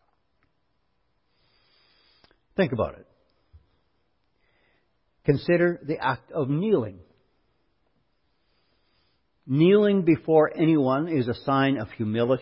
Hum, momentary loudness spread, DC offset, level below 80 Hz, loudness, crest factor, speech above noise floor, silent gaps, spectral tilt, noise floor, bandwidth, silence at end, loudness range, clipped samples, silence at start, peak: none; 10 LU; under 0.1%; -58 dBFS; -24 LUFS; 20 dB; 51 dB; none; -11.5 dB/octave; -74 dBFS; 5.6 kHz; 0 s; 11 LU; under 0.1%; 2.6 s; -6 dBFS